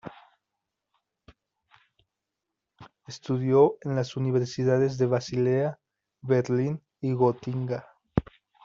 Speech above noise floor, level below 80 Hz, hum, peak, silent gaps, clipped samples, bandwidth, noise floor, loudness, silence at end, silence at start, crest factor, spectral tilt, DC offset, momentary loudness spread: 61 dB; -54 dBFS; none; -6 dBFS; none; under 0.1%; 7.4 kHz; -85 dBFS; -26 LUFS; 0.45 s; 0.05 s; 22 dB; -7.5 dB/octave; under 0.1%; 11 LU